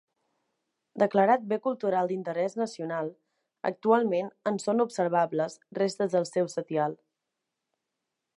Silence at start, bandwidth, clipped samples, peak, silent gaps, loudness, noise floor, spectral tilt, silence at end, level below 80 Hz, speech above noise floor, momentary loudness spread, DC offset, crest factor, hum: 0.95 s; 11.5 kHz; under 0.1%; -8 dBFS; none; -28 LUFS; -85 dBFS; -6 dB/octave; 1.45 s; -84 dBFS; 58 dB; 10 LU; under 0.1%; 20 dB; none